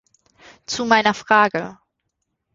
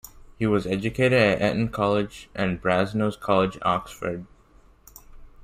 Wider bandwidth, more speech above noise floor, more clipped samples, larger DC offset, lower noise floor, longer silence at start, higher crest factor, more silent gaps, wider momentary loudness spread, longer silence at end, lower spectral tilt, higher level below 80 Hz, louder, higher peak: second, 7.8 kHz vs 15.5 kHz; first, 58 dB vs 31 dB; neither; neither; first, -76 dBFS vs -55 dBFS; first, 0.7 s vs 0.05 s; about the same, 20 dB vs 20 dB; neither; about the same, 12 LU vs 12 LU; first, 0.8 s vs 0.15 s; second, -3.5 dB/octave vs -6.5 dB/octave; second, -60 dBFS vs -50 dBFS; first, -18 LUFS vs -24 LUFS; about the same, -2 dBFS vs -4 dBFS